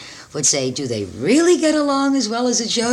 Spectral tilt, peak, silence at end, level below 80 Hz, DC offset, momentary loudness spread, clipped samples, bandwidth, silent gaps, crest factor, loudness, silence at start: -3 dB/octave; -4 dBFS; 0 s; -56 dBFS; under 0.1%; 9 LU; under 0.1%; 13 kHz; none; 14 dB; -17 LUFS; 0 s